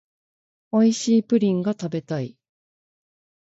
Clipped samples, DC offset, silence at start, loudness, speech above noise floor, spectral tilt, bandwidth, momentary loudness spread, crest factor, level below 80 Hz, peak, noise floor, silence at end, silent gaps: under 0.1%; under 0.1%; 0.75 s; -22 LUFS; over 69 dB; -6 dB/octave; 8 kHz; 11 LU; 16 dB; -68 dBFS; -8 dBFS; under -90 dBFS; 1.2 s; none